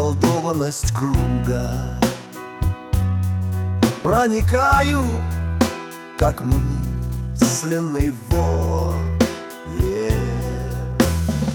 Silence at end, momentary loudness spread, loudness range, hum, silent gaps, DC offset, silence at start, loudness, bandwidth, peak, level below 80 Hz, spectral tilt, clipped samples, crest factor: 0 s; 8 LU; 3 LU; none; none; under 0.1%; 0 s; -21 LUFS; 19.5 kHz; -2 dBFS; -28 dBFS; -6 dB/octave; under 0.1%; 18 dB